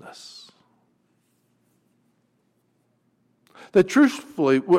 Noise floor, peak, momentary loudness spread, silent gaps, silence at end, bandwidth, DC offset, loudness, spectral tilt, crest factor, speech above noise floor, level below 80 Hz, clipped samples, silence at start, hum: -68 dBFS; -6 dBFS; 24 LU; none; 0 s; 14 kHz; under 0.1%; -20 LUFS; -6 dB/octave; 18 dB; 49 dB; -66 dBFS; under 0.1%; 0.05 s; none